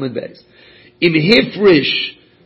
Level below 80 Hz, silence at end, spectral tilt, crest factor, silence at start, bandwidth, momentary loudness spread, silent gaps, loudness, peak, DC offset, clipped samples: -52 dBFS; 0.35 s; -7 dB/octave; 16 dB; 0 s; 8 kHz; 15 LU; none; -13 LUFS; 0 dBFS; under 0.1%; under 0.1%